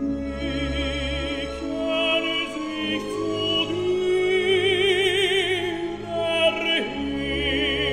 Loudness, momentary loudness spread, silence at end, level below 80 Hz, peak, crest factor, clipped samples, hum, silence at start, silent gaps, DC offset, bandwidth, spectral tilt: -23 LUFS; 8 LU; 0 s; -40 dBFS; -8 dBFS; 16 dB; under 0.1%; none; 0 s; none; 0.2%; 13 kHz; -4.5 dB/octave